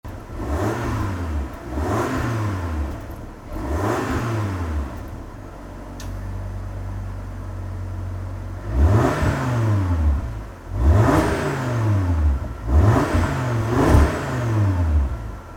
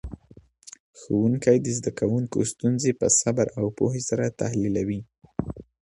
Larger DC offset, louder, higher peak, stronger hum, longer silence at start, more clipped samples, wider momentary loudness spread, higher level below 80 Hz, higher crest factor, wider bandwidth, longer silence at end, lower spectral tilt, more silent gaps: neither; about the same, -22 LUFS vs -24 LUFS; first, -2 dBFS vs -6 dBFS; neither; about the same, 0.05 s vs 0.05 s; neither; about the same, 16 LU vs 14 LU; first, -28 dBFS vs -50 dBFS; about the same, 18 dB vs 18 dB; first, 16 kHz vs 11.5 kHz; second, 0 s vs 0.25 s; first, -7.5 dB/octave vs -5.5 dB/octave; second, none vs 0.80-0.93 s